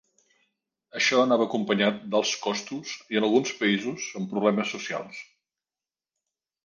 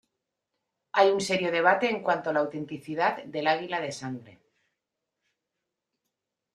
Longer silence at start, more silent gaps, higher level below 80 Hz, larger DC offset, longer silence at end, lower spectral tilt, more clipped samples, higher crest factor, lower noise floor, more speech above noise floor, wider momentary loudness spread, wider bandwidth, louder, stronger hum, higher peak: about the same, 0.95 s vs 0.95 s; neither; about the same, -74 dBFS vs -74 dBFS; neither; second, 1.4 s vs 2.25 s; about the same, -4 dB/octave vs -4 dB/octave; neither; about the same, 20 dB vs 22 dB; first, under -90 dBFS vs -85 dBFS; first, over 64 dB vs 58 dB; about the same, 13 LU vs 13 LU; second, 9.8 kHz vs 13 kHz; about the same, -26 LUFS vs -26 LUFS; neither; about the same, -8 dBFS vs -6 dBFS